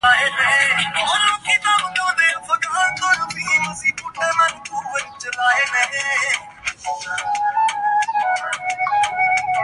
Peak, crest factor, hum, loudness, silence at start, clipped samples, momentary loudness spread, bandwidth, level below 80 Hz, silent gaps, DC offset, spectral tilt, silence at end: -2 dBFS; 16 dB; none; -18 LUFS; 0.05 s; under 0.1%; 10 LU; 11.5 kHz; -56 dBFS; none; under 0.1%; 0 dB/octave; 0 s